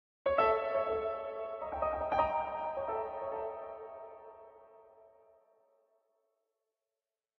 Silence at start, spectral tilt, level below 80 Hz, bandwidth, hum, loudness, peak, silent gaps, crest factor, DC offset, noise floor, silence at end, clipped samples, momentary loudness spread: 0.25 s; -3 dB/octave; -60 dBFS; 6 kHz; none; -35 LUFS; -14 dBFS; none; 22 dB; under 0.1%; under -90 dBFS; 2.35 s; under 0.1%; 19 LU